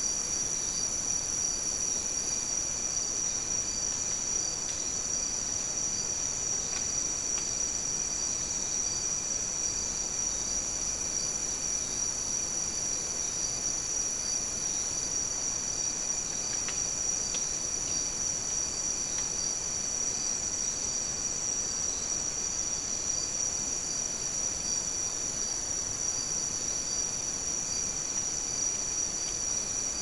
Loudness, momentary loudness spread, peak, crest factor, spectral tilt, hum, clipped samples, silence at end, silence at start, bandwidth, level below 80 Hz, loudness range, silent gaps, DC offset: -29 LUFS; 1 LU; -18 dBFS; 14 dB; 0 dB/octave; none; under 0.1%; 0 s; 0 s; 12 kHz; -52 dBFS; 1 LU; none; 0.2%